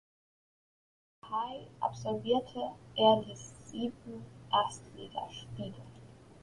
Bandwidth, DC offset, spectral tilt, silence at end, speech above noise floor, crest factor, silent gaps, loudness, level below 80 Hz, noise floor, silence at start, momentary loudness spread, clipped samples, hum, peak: 11.5 kHz; under 0.1%; -5 dB/octave; 0.05 s; 20 dB; 22 dB; none; -34 LUFS; -66 dBFS; -54 dBFS; 1.25 s; 20 LU; under 0.1%; none; -12 dBFS